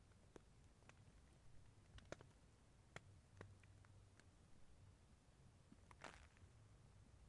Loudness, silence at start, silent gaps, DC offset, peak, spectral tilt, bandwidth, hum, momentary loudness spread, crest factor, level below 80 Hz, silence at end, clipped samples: -65 LUFS; 0 s; none; under 0.1%; -34 dBFS; -4.5 dB/octave; 11 kHz; none; 8 LU; 32 dB; -74 dBFS; 0 s; under 0.1%